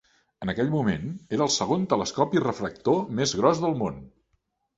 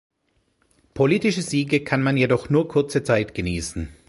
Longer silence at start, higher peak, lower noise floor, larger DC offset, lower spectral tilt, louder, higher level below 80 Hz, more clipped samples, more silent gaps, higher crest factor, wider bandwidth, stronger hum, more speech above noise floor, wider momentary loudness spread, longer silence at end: second, 0.4 s vs 0.95 s; about the same, -4 dBFS vs -4 dBFS; first, -73 dBFS vs -68 dBFS; neither; about the same, -5 dB/octave vs -6 dB/octave; second, -26 LUFS vs -21 LUFS; second, -54 dBFS vs -44 dBFS; neither; neither; about the same, 22 dB vs 18 dB; second, 8.2 kHz vs 11.5 kHz; neither; about the same, 48 dB vs 47 dB; about the same, 9 LU vs 7 LU; first, 0.7 s vs 0.15 s